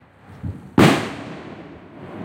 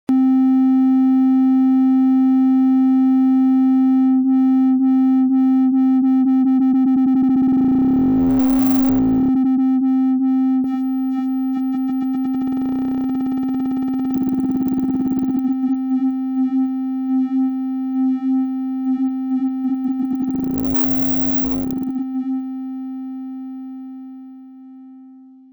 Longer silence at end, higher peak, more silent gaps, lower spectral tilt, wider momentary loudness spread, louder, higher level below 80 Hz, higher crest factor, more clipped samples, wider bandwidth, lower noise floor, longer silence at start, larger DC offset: second, 0 s vs 0.35 s; first, 0 dBFS vs -4 dBFS; neither; second, -6 dB/octave vs -8.5 dB/octave; first, 24 LU vs 8 LU; about the same, -18 LUFS vs -17 LUFS; about the same, -48 dBFS vs -48 dBFS; first, 22 dB vs 12 dB; neither; second, 16.5 kHz vs over 20 kHz; second, -39 dBFS vs -43 dBFS; first, 0.45 s vs 0.1 s; neither